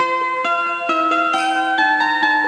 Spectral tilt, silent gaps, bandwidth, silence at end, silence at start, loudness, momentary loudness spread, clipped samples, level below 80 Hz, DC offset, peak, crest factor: -2 dB/octave; none; 11 kHz; 0 s; 0 s; -17 LUFS; 3 LU; under 0.1%; -74 dBFS; under 0.1%; -6 dBFS; 12 dB